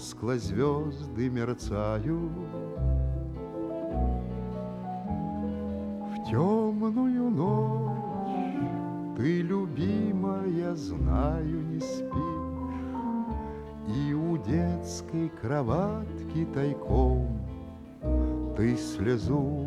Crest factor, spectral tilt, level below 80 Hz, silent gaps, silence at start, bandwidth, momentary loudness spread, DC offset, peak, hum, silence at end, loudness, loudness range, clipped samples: 16 dB; -8 dB/octave; -38 dBFS; none; 0 s; 11.5 kHz; 8 LU; under 0.1%; -14 dBFS; none; 0 s; -30 LUFS; 4 LU; under 0.1%